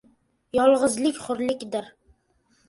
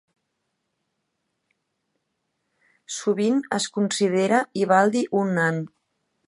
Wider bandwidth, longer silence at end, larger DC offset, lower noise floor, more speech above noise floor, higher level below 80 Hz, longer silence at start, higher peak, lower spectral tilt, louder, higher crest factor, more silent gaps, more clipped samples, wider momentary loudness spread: about the same, 11.5 kHz vs 11.5 kHz; first, 0.8 s vs 0.6 s; neither; second, -66 dBFS vs -77 dBFS; second, 43 dB vs 55 dB; first, -60 dBFS vs -74 dBFS; second, 0.55 s vs 2.9 s; about the same, -6 dBFS vs -4 dBFS; second, -3.5 dB/octave vs -5 dB/octave; about the same, -24 LUFS vs -22 LUFS; about the same, 18 dB vs 22 dB; neither; neither; about the same, 12 LU vs 10 LU